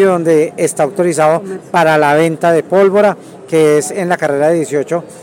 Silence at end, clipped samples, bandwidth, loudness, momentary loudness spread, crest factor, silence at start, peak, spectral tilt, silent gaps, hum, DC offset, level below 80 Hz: 0 s; under 0.1%; 17 kHz; -12 LUFS; 7 LU; 10 dB; 0 s; -2 dBFS; -5.5 dB/octave; none; none; under 0.1%; -64 dBFS